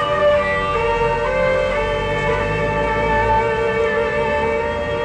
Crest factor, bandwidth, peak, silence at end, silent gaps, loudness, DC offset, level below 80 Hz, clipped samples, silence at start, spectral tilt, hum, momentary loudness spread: 10 dB; 9.6 kHz; -8 dBFS; 0 s; none; -18 LUFS; under 0.1%; -32 dBFS; under 0.1%; 0 s; -6 dB/octave; none; 4 LU